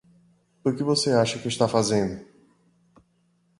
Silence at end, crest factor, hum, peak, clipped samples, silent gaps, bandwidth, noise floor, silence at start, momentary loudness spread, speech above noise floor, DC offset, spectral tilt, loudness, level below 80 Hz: 1.35 s; 22 dB; none; -6 dBFS; under 0.1%; none; 11.5 kHz; -67 dBFS; 0.65 s; 9 LU; 43 dB; under 0.1%; -4.5 dB/octave; -24 LUFS; -58 dBFS